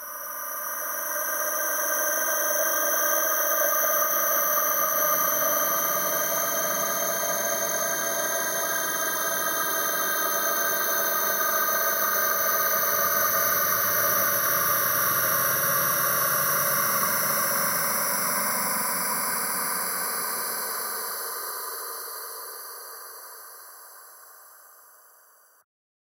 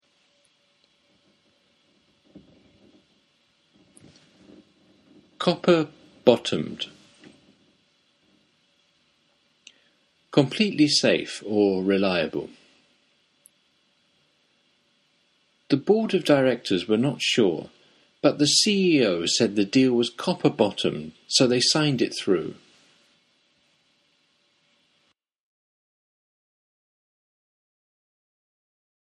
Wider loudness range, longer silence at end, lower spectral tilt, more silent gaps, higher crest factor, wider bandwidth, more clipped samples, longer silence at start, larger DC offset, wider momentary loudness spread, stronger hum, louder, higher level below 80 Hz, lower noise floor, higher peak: about the same, 10 LU vs 11 LU; second, 1.45 s vs 6.65 s; second, -0.5 dB/octave vs -4 dB/octave; neither; second, 16 dB vs 26 dB; first, 16 kHz vs 11.5 kHz; neither; second, 0 s vs 2.35 s; neither; about the same, 10 LU vs 10 LU; neither; about the same, -23 LUFS vs -22 LUFS; about the same, -68 dBFS vs -68 dBFS; second, -57 dBFS vs -70 dBFS; second, -10 dBFS vs 0 dBFS